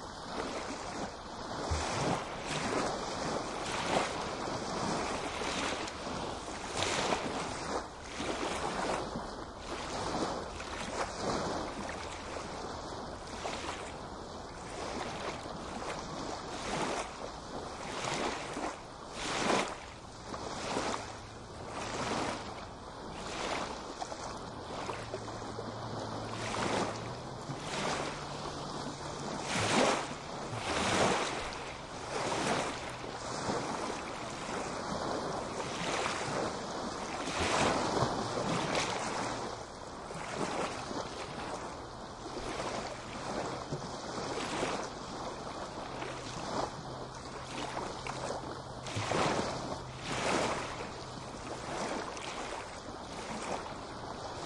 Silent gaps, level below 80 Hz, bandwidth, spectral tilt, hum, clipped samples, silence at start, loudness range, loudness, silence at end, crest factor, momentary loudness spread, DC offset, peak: none; -56 dBFS; 11.5 kHz; -3.5 dB/octave; none; under 0.1%; 0 s; 6 LU; -37 LUFS; 0 s; 24 dB; 11 LU; under 0.1%; -14 dBFS